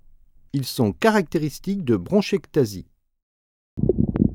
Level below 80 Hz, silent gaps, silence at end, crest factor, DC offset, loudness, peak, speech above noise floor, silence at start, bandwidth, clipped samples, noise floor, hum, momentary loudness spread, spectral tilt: -42 dBFS; 3.23-3.77 s; 0 s; 20 dB; under 0.1%; -23 LUFS; -4 dBFS; 28 dB; 0.55 s; 18 kHz; under 0.1%; -50 dBFS; none; 9 LU; -6.5 dB/octave